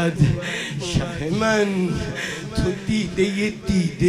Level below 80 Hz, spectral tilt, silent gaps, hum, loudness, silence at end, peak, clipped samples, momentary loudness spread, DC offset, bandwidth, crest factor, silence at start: -38 dBFS; -5.5 dB/octave; none; none; -22 LUFS; 0 s; -4 dBFS; under 0.1%; 7 LU; under 0.1%; 15.5 kHz; 18 dB; 0 s